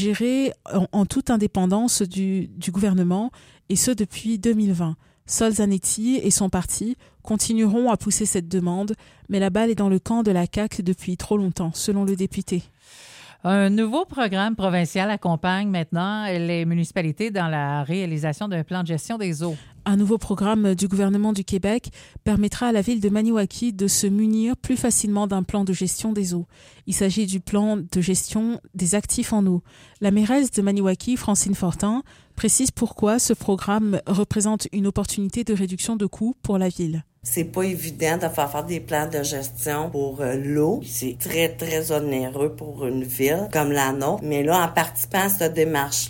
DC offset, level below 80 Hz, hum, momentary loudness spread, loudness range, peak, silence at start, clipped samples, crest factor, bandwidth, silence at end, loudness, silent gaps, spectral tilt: under 0.1%; -46 dBFS; none; 7 LU; 3 LU; -6 dBFS; 0 s; under 0.1%; 18 dB; 17 kHz; 0 s; -22 LUFS; none; -5 dB/octave